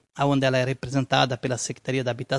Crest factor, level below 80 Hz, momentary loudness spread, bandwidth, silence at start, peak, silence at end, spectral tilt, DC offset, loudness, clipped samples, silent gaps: 20 dB; -56 dBFS; 6 LU; 11.5 kHz; 0.15 s; -6 dBFS; 0 s; -5 dB/octave; under 0.1%; -24 LUFS; under 0.1%; none